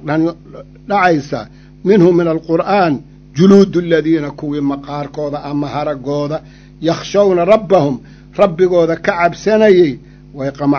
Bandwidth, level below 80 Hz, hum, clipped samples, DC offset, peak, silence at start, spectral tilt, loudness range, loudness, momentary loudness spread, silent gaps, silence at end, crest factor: 7.2 kHz; -44 dBFS; none; 0.3%; under 0.1%; 0 dBFS; 0.05 s; -7 dB/octave; 5 LU; -14 LUFS; 14 LU; none; 0 s; 14 dB